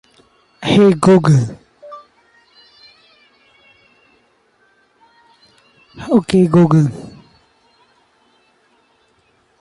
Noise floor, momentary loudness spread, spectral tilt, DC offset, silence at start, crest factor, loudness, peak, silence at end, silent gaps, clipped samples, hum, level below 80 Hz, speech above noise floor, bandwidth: -58 dBFS; 27 LU; -7.5 dB/octave; under 0.1%; 0.6 s; 16 dB; -13 LUFS; -2 dBFS; 2.5 s; none; under 0.1%; none; -52 dBFS; 47 dB; 11.5 kHz